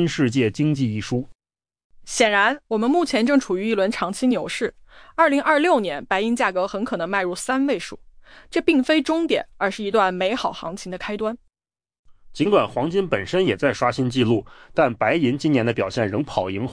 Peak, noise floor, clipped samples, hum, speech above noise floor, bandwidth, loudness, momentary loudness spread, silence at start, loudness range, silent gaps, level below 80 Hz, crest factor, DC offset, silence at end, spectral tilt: -6 dBFS; under -90 dBFS; under 0.1%; none; over 69 dB; 10.5 kHz; -21 LUFS; 9 LU; 0 s; 3 LU; 1.35-1.39 s, 1.84-1.90 s, 11.99-12.04 s; -52 dBFS; 16 dB; under 0.1%; 0 s; -5.5 dB/octave